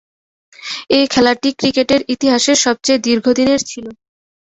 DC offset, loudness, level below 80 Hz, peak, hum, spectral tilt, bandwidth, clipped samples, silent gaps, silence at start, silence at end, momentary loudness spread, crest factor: under 0.1%; -14 LUFS; -52 dBFS; 0 dBFS; none; -2.5 dB/octave; 8.4 kHz; under 0.1%; none; 0.6 s; 0.65 s; 14 LU; 14 dB